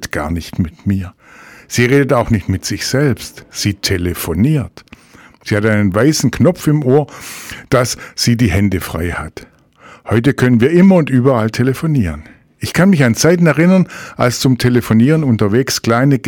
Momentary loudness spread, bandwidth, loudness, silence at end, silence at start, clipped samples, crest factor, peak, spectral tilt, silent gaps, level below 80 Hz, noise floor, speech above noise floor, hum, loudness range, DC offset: 11 LU; 19 kHz; -13 LUFS; 0 s; 0 s; under 0.1%; 12 dB; -2 dBFS; -6 dB/octave; none; -36 dBFS; -43 dBFS; 30 dB; none; 4 LU; under 0.1%